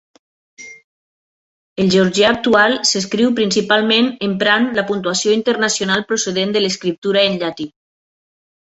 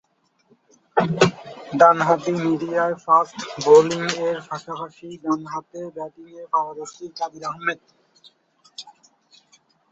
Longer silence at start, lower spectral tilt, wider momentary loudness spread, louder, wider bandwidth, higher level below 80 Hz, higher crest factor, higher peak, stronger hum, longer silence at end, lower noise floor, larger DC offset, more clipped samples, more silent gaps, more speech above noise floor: second, 0.6 s vs 0.95 s; second, -3.5 dB/octave vs -5 dB/octave; second, 9 LU vs 21 LU; first, -15 LUFS vs -20 LUFS; about the same, 8.2 kHz vs 8 kHz; first, -56 dBFS vs -64 dBFS; second, 16 dB vs 22 dB; about the same, -2 dBFS vs 0 dBFS; neither; about the same, 0.95 s vs 1 s; first, under -90 dBFS vs -63 dBFS; neither; neither; first, 0.84-1.76 s, 6.98-7.02 s vs none; first, over 74 dB vs 42 dB